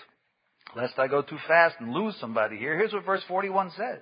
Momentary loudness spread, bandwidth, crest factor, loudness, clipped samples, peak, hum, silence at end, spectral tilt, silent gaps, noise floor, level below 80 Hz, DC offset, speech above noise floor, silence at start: 11 LU; 5.2 kHz; 22 dB; -27 LUFS; under 0.1%; -6 dBFS; none; 0 s; -9.5 dB/octave; none; -72 dBFS; -78 dBFS; under 0.1%; 46 dB; 0 s